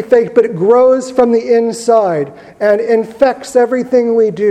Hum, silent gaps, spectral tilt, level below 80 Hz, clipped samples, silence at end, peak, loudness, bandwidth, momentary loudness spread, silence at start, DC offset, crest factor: none; none; -6 dB/octave; -54 dBFS; 0.2%; 0 s; 0 dBFS; -12 LUFS; 10.5 kHz; 5 LU; 0 s; under 0.1%; 12 dB